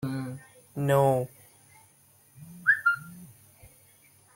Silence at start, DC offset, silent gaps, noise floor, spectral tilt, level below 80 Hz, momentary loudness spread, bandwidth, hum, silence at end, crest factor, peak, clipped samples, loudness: 0 s; under 0.1%; none; -60 dBFS; -6.5 dB/octave; -66 dBFS; 24 LU; 17 kHz; none; 0.7 s; 20 dB; -12 dBFS; under 0.1%; -26 LUFS